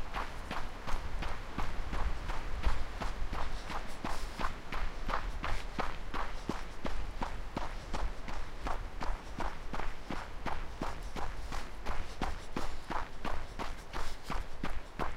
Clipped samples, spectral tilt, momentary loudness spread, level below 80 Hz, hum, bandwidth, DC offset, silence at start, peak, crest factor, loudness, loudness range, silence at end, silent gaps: under 0.1%; -5 dB/octave; 4 LU; -38 dBFS; none; 11 kHz; under 0.1%; 0 s; -16 dBFS; 18 dB; -41 LUFS; 2 LU; 0 s; none